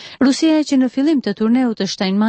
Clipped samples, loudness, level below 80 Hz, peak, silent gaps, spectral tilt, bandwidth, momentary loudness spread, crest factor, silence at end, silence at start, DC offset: under 0.1%; -16 LUFS; -60 dBFS; -4 dBFS; none; -5 dB/octave; 8.8 kHz; 4 LU; 12 dB; 0 s; 0 s; under 0.1%